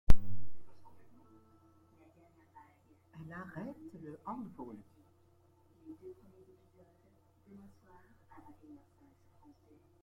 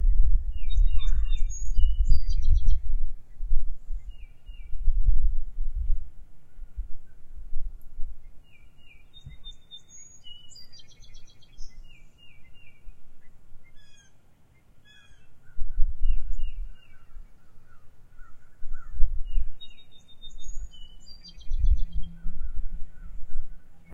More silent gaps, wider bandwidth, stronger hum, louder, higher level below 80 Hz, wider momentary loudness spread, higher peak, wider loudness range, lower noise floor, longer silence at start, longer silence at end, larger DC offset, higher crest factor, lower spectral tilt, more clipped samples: neither; second, 4.3 kHz vs 7 kHz; neither; second, -47 LUFS vs -34 LUFS; second, -46 dBFS vs -26 dBFS; second, 22 LU vs 26 LU; second, -6 dBFS vs -2 dBFS; second, 12 LU vs 21 LU; first, -68 dBFS vs -54 dBFS; about the same, 0.1 s vs 0 s; first, 5.6 s vs 0.15 s; neither; first, 26 dB vs 18 dB; first, -7.5 dB/octave vs -4.5 dB/octave; neither